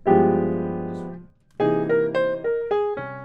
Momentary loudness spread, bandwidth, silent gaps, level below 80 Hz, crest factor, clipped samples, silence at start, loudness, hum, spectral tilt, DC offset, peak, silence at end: 16 LU; 5.2 kHz; none; -54 dBFS; 18 dB; under 0.1%; 0.05 s; -23 LUFS; none; -9.5 dB/octave; under 0.1%; -4 dBFS; 0 s